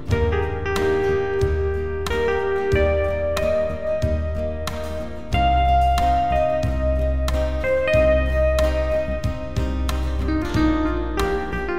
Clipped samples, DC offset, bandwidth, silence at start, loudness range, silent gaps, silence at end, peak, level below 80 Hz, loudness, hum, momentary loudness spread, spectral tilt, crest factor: under 0.1%; 2%; 15 kHz; 0 s; 3 LU; none; 0 s; -6 dBFS; -26 dBFS; -22 LUFS; none; 8 LU; -6.5 dB/octave; 14 dB